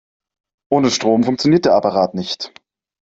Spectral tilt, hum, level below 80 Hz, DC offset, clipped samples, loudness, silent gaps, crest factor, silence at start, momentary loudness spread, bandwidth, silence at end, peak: -5 dB/octave; none; -56 dBFS; under 0.1%; under 0.1%; -16 LUFS; none; 16 dB; 0.7 s; 11 LU; 8 kHz; 0.55 s; -2 dBFS